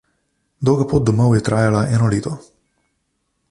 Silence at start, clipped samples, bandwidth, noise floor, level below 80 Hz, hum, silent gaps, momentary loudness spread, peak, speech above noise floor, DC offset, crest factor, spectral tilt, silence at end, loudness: 0.6 s; under 0.1%; 11.5 kHz; -70 dBFS; -42 dBFS; none; none; 8 LU; -2 dBFS; 54 dB; under 0.1%; 16 dB; -7.5 dB/octave; 1.1 s; -17 LUFS